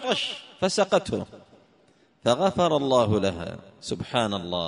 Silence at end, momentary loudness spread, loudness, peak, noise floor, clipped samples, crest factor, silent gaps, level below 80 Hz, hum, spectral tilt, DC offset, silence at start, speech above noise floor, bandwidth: 0 s; 13 LU; -25 LUFS; -6 dBFS; -61 dBFS; under 0.1%; 20 dB; none; -56 dBFS; none; -5 dB/octave; under 0.1%; 0 s; 36 dB; 10.5 kHz